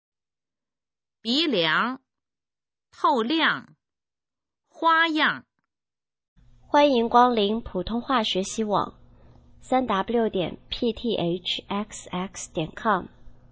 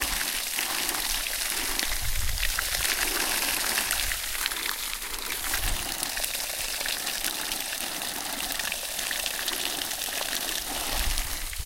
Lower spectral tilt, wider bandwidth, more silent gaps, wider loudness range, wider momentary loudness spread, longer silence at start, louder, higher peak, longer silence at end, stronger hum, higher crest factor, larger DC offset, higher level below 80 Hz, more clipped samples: first, -4 dB/octave vs 0 dB/octave; second, 8 kHz vs 17 kHz; first, 6.28-6.36 s vs none; about the same, 4 LU vs 3 LU; first, 12 LU vs 5 LU; first, 1.25 s vs 0 s; first, -24 LUFS vs -27 LUFS; about the same, -4 dBFS vs -2 dBFS; first, 0.2 s vs 0 s; neither; about the same, 22 dB vs 26 dB; neither; second, -54 dBFS vs -38 dBFS; neither